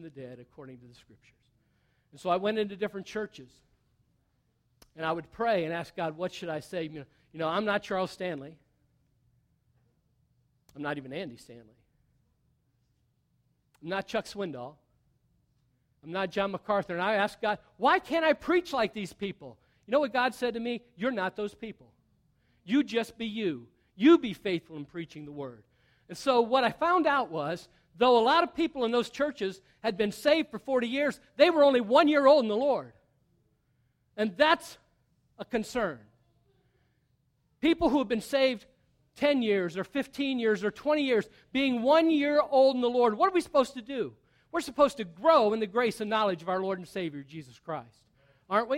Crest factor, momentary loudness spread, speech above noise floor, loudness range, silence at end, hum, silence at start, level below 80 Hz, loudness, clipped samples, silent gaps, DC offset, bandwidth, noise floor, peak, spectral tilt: 22 dB; 17 LU; 45 dB; 14 LU; 0 s; none; 0 s; -64 dBFS; -28 LUFS; under 0.1%; none; under 0.1%; 15.5 kHz; -73 dBFS; -8 dBFS; -5 dB/octave